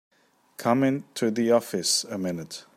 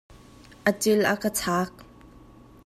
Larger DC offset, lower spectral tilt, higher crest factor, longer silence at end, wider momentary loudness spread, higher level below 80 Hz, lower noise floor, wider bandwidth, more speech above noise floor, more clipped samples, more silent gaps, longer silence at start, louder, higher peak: neither; about the same, -4 dB/octave vs -4 dB/octave; about the same, 18 dB vs 22 dB; second, 0.15 s vs 0.8 s; about the same, 8 LU vs 6 LU; second, -72 dBFS vs -56 dBFS; about the same, -48 dBFS vs -50 dBFS; about the same, 15.5 kHz vs 15 kHz; about the same, 23 dB vs 26 dB; neither; neither; about the same, 0.6 s vs 0.65 s; about the same, -25 LUFS vs -25 LUFS; about the same, -8 dBFS vs -6 dBFS